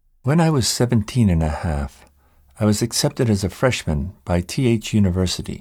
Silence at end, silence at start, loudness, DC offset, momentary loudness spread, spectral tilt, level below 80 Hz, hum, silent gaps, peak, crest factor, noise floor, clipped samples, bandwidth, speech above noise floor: 0.05 s; 0.25 s; -20 LUFS; under 0.1%; 7 LU; -5.5 dB/octave; -36 dBFS; none; none; -4 dBFS; 14 dB; -54 dBFS; under 0.1%; 17 kHz; 35 dB